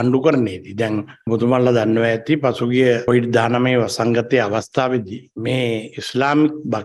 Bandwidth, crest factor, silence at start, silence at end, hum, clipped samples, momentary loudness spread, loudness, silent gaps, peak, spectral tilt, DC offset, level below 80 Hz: 12.5 kHz; 16 dB; 0 s; 0 s; none; under 0.1%; 8 LU; -18 LUFS; none; -2 dBFS; -6.5 dB/octave; under 0.1%; -58 dBFS